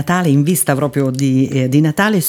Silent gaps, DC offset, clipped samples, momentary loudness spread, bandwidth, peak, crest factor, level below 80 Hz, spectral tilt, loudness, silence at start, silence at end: none; under 0.1%; under 0.1%; 3 LU; over 20 kHz; 0 dBFS; 14 dB; -52 dBFS; -5.5 dB/octave; -14 LUFS; 0 s; 0 s